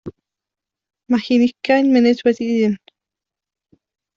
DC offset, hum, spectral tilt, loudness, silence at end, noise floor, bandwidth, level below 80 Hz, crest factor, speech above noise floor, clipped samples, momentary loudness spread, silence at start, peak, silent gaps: under 0.1%; none; -6 dB/octave; -16 LUFS; 1.4 s; -87 dBFS; 7.2 kHz; -62 dBFS; 16 dB; 71 dB; under 0.1%; 7 LU; 0.05 s; -4 dBFS; none